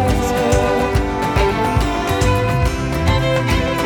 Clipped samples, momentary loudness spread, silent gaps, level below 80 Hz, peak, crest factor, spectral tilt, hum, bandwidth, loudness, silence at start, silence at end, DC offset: under 0.1%; 3 LU; none; -24 dBFS; -4 dBFS; 12 dB; -5.5 dB/octave; none; 19 kHz; -17 LUFS; 0 s; 0 s; under 0.1%